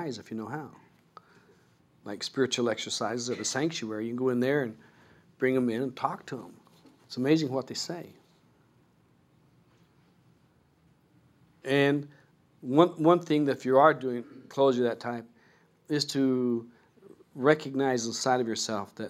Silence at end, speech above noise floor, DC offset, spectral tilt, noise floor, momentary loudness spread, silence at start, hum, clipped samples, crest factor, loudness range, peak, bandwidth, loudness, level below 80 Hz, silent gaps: 0 s; 37 dB; under 0.1%; -4.5 dB/octave; -65 dBFS; 17 LU; 0 s; none; under 0.1%; 24 dB; 8 LU; -6 dBFS; 15 kHz; -28 LUFS; -78 dBFS; none